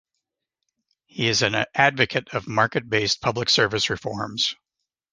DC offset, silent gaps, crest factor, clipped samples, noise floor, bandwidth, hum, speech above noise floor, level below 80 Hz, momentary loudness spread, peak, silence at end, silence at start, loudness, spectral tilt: under 0.1%; none; 22 dB; under 0.1%; -83 dBFS; 10.5 kHz; none; 61 dB; -56 dBFS; 8 LU; -2 dBFS; 0.6 s; 1.15 s; -22 LUFS; -3 dB/octave